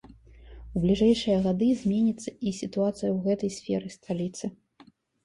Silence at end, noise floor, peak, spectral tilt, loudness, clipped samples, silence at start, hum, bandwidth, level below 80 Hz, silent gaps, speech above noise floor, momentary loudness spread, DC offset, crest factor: 0.75 s; -58 dBFS; -10 dBFS; -6.5 dB/octave; -27 LUFS; under 0.1%; 0.05 s; none; 11.5 kHz; -50 dBFS; none; 32 dB; 11 LU; under 0.1%; 18 dB